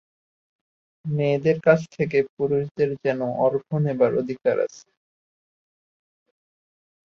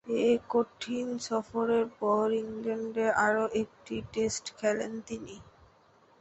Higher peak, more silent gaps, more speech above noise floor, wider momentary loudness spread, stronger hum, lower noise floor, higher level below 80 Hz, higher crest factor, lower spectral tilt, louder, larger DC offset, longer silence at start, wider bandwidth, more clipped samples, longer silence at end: first, -4 dBFS vs -14 dBFS; first, 2.29-2.37 s, 2.71-2.75 s vs none; first, over 68 dB vs 32 dB; second, 5 LU vs 12 LU; neither; first, under -90 dBFS vs -62 dBFS; about the same, -66 dBFS vs -64 dBFS; about the same, 22 dB vs 18 dB; first, -8 dB/octave vs -4 dB/octave; first, -23 LUFS vs -30 LUFS; neither; first, 1.05 s vs 0.05 s; second, 7.2 kHz vs 8.2 kHz; neither; first, 2.3 s vs 0.7 s